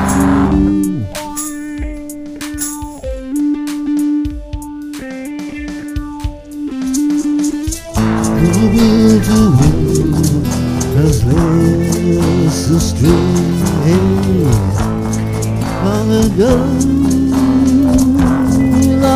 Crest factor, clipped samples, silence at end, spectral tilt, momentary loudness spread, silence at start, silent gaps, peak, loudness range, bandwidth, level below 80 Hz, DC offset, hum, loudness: 12 dB; under 0.1%; 0 s; -6.5 dB/octave; 14 LU; 0 s; none; 0 dBFS; 8 LU; 16 kHz; -26 dBFS; under 0.1%; none; -13 LUFS